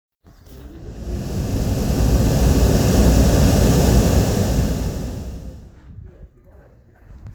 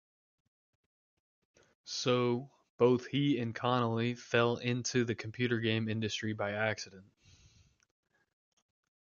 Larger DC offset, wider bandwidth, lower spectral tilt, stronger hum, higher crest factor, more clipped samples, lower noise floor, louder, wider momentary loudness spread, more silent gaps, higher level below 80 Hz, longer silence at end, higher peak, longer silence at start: neither; first, over 20 kHz vs 7.4 kHz; about the same, -6 dB/octave vs -5.5 dB/octave; neither; second, 16 dB vs 22 dB; neither; second, -48 dBFS vs -65 dBFS; first, -18 LUFS vs -33 LUFS; first, 19 LU vs 6 LU; second, none vs 2.70-2.78 s; first, -22 dBFS vs -70 dBFS; second, 0 s vs 2.05 s; first, -2 dBFS vs -14 dBFS; second, 0.5 s vs 1.85 s